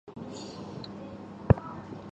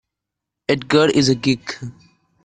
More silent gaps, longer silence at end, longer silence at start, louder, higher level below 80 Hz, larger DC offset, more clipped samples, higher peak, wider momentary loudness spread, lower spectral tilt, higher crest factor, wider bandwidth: neither; second, 0 s vs 0.55 s; second, 0.05 s vs 0.7 s; second, -32 LUFS vs -17 LUFS; first, -44 dBFS vs -54 dBFS; neither; neither; about the same, -4 dBFS vs -4 dBFS; about the same, 16 LU vs 16 LU; first, -8 dB/octave vs -5 dB/octave; first, 28 dB vs 16 dB; second, 8.2 kHz vs 9.6 kHz